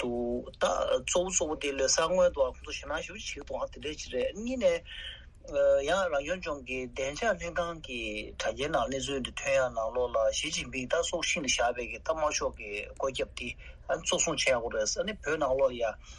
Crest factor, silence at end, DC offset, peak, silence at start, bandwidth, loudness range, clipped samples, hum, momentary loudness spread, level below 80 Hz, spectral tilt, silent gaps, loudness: 18 dB; 0 s; under 0.1%; -14 dBFS; 0 s; 11.5 kHz; 3 LU; under 0.1%; none; 10 LU; -50 dBFS; -2.5 dB/octave; none; -31 LUFS